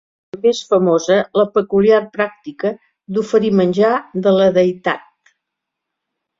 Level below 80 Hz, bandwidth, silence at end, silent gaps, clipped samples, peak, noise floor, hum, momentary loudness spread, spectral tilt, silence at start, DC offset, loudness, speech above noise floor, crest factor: -58 dBFS; 7.6 kHz; 1.4 s; none; under 0.1%; -2 dBFS; -80 dBFS; none; 10 LU; -6 dB/octave; 0.35 s; under 0.1%; -16 LUFS; 65 dB; 16 dB